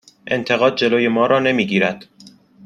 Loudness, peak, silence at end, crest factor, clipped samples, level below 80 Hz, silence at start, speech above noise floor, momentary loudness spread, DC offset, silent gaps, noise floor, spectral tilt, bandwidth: -17 LUFS; -2 dBFS; 0.4 s; 16 dB; under 0.1%; -62 dBFS; 0.25 s; 29 dB; 8 LU; under 0.1%; none; -46 dBFS; -5.5 dB/octave; 10 kHz